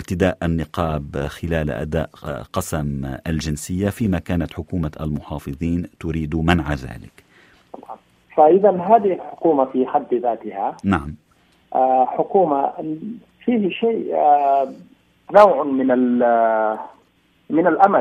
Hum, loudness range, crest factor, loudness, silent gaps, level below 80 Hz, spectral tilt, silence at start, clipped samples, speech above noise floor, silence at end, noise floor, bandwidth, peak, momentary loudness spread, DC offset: none; 7 LU; 20 dB; -19 LUFS; none; -40 dBFS; -7 dB/octave; 0 s; under 0.1%; 40 dB; 0 s; -59 dBFS; 15 kHz; 0 dBFS; 13 LU; under 0.1%